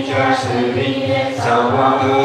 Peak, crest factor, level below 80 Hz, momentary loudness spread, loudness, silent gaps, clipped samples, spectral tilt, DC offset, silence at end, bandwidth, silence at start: 0 dBFS; 14 dB; -54 dBFS; 4 LU; -16 LUFS; none; under 0.1%; -6 dB/octave; under 0.1%; 0 s; 12.5 kHz; 0 s